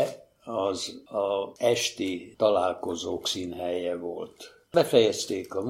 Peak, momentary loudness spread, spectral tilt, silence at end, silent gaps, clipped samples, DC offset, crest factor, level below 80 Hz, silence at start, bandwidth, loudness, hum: -6 dBFS; 12 LU; -3.5 dB/octave; 0 s; none; under 0.1%; under 0.1%; 22 dB; -66 dBFS; 0 s; 16 kHz; -27 LUFS; none